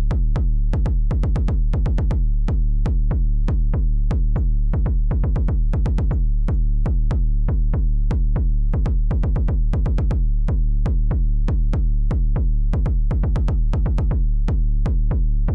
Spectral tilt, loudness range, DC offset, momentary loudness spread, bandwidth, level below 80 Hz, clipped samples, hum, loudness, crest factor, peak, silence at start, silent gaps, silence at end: -9.5 dB/octave; 0 LU; under 0.1%; 1 LU; 3.2 kHz; -18 dBFS; under 0.1%; none; -22 LUFS; 4 dB; -12 dBFS; 0 s; none; 0 s